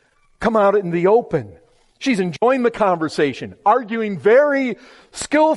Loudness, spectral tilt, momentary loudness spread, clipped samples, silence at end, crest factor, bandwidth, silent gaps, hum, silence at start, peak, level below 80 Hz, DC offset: -18 LUFS; -5.5 dB/octave; 11 LU; under 0.1%; 0 s; 14 dB; 11.5 kHz; none; none; 0.4 s; -4 dBFS; -54 dBFS; under 0.1%